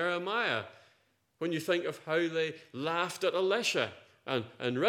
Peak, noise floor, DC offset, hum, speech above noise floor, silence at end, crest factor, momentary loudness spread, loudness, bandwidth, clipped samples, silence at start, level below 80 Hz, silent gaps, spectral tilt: -12 dBFS; -71 dBFS; under 0.1%; none; 39 dB; 0 s; 20 dB; 8 LU; -32 LUFS; 17 kHz; under 0.1%; 0 s; -86 dBFS; none; -4 dB/octave